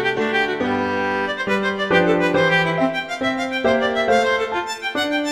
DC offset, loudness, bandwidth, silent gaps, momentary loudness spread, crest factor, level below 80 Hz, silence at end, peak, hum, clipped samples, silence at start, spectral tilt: 0.1%; -19 LUFS; 15 kHz; none; 6 LU; 16 dB; -52 dBFS; 0 s; -4 dBFS; none; under 0.1%; 0 s; -5 dB/octave